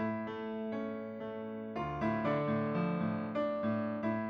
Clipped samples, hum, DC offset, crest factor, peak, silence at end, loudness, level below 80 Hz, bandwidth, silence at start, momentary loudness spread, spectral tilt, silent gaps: under 0.1%; none; under 0.1%; 14 dB; -22 dBFS; 0 s; -36 LUFS; -64 dBFS; 6.2 kHz; 0 s; 9 LU; -9 dB/octave; none